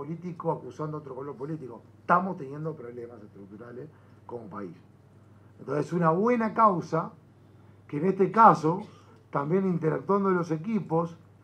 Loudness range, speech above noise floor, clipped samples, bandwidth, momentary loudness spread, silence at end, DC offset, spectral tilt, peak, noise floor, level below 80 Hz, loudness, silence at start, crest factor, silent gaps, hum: 12 LU; 27 dB; under 0.1%; 9.4 kHz; 21 LU; 0.3 s; under 0.1%; -8.5 dB/octave; -4 dBFS; -55 dBFS; -76 dBFS; -27 LUFS; 0 s; 24 dB; none; none